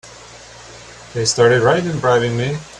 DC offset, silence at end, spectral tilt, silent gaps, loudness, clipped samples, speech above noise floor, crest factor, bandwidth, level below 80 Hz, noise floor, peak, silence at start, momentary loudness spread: under 0.1%; 0 s; -4.5 dB/octave; none; -15 LUFS; under 0.1%; 23 dB; 18 dB; 11 kHz; -48 dBFS; -39 dBFS; 0 dBFS; 0.05 s; 25 LU